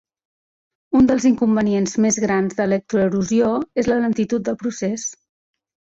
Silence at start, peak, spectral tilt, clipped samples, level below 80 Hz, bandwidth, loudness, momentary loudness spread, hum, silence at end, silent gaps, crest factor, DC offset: 0.9 s; -6 dBFS; -5.5 dB/octave; under 0.1%; -50 dBFS; 8 kHz; -19 LUFS; 8 LU; none; 0.85 s; none; 14 dB; under 0.1%